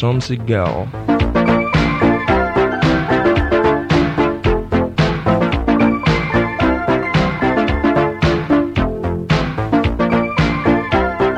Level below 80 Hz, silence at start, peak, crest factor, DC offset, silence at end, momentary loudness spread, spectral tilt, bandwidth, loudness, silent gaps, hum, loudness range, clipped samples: -28 dBFS; 0 s; -2 dBFS; 14 dB; under 0.1%; 0 s; 3 LU; -7.5 dB/octave; 9.2 kHz; -16 LUFS; none; none; 1 LU; under 0.1%